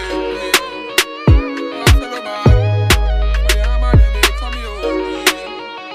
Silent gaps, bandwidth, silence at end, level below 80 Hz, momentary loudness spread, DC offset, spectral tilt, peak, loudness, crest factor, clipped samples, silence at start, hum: none; 15.5 kHz; 0 s; -18 dBFS; 10 LU; under 0.1%; -4.5 dB/octave; 0 dBFS; -15 LUFS; 14 dB; under 0.1%; 0 s; none